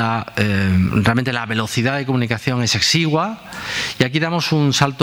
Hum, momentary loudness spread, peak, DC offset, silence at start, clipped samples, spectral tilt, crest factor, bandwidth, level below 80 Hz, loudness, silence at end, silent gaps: none; 6 LU; 0 dBFS; under 0.1%; 0 s; under 0.1%; -4.5 dB/octave; 18 dB; over 20 kHz; -44 dBFS; -18 LUFS; 0 s; none